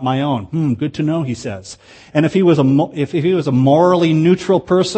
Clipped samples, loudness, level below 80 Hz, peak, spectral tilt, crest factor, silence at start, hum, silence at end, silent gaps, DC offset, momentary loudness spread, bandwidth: under 0.1%; -15 LUFS; -52 dBFS; 0 dBFS; -7 dB/octave; 14 dB; 0 s; none; 0 s; none; under 0.1%; 10 LU; 8.8 kHz